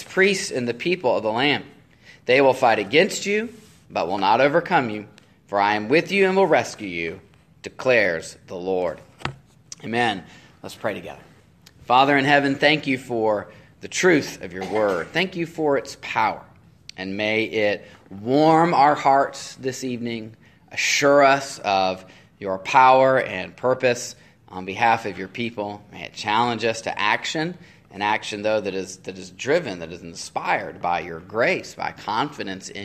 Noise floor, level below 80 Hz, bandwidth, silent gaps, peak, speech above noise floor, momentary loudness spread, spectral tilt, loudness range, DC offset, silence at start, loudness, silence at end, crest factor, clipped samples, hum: -52 dBFS; -62 dBFS; 14 kHz; none; -2 dBFS; 30 dB; 17 LU; -4 dB/octave; 6 LU; under 0.1%; 0 s; -21 LUFS; 0 s; 20 dB; under 0.1%; none